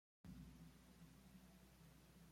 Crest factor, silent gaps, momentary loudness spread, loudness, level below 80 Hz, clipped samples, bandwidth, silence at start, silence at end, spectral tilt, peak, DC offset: 16 dB; none; 6 LU; -65 LUFS; -72 dBFS; under 0.1%; 16.5 kHz; 0.25 s; 0 s; -5.5 dB/octave; -48 dBFS; under 0.1%